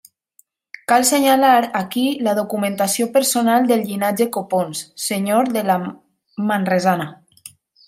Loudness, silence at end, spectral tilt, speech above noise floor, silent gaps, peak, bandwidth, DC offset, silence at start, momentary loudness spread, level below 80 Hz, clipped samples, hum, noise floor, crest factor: -18 LUFS; 0.4 s; -4 dB/octave; 41 dB; none; -2 dBFS; 16 kHz; under 0.1%; 0.9 s; 11 LU; -68 dBFS; under 0.1%; none; -58 dBFS; 18 dB